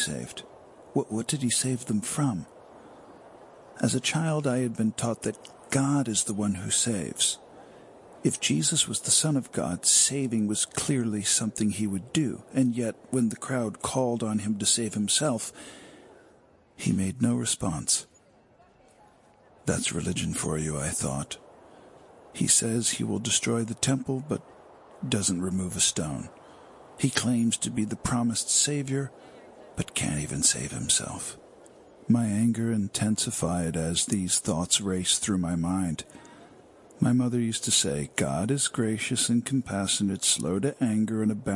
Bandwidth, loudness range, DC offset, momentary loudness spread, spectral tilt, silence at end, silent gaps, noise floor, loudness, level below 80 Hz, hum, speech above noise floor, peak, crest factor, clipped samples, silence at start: 11.5 kHz; 6 LU; under 0.1%; 9 LU; -3.5 dB/octave; 0 s; none; -59 dBFS; -26 LUFS; -58 dBFS; none; 32 dB; -6 dBFS; 22 dB; under 0.1%; 0 s